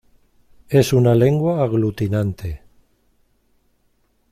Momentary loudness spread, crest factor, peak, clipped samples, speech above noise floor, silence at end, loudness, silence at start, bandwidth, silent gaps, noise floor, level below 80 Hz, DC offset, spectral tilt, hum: 15 LU; 18 dB; -4 dBFS; under 0.1%; 46 dB; 1.75 s; -18 LUFS; 0.7 s; 15.5 kHz; none; -63 dBFS; -46 dBFS; under 0.1%; -7.5 dB/octave; none